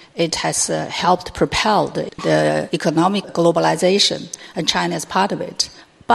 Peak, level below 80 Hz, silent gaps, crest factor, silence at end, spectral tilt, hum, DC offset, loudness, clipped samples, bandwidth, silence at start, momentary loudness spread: 0 dBFS; -48 dBFS; none; 18 dB; 0 s; -3.5 dB/octave; none; under 0.1%; -18 LUFS; under 0.1%; 13.5 kHz; 0.15 s; 7 LU